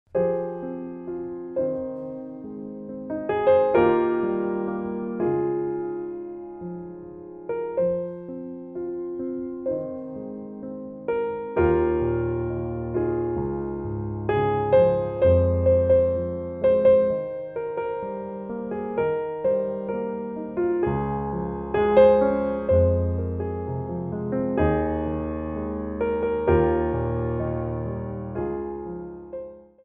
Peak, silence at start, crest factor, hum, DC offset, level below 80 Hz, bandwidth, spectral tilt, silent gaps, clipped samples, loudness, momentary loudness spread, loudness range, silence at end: -4 dBFS; 0.15 s; 20 dB; none; under 0.1%; -42 dBFS; 4 kHz; -11.5 dB/octave; none; under 0.1%; -25 LUFS; 16 LU; 9 LU; 0.2 s